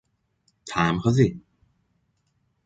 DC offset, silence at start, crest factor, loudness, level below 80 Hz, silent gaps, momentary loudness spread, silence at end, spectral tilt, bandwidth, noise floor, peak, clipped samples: under 0.1%; 0.65 s; 20 dB; -23 LUFS; -52 dBFS; none; 23 LU; 1.25 s; -6.5 dB/octave; 9.2 kHz; -71 dBFS; -6 dBFS; under 0.1%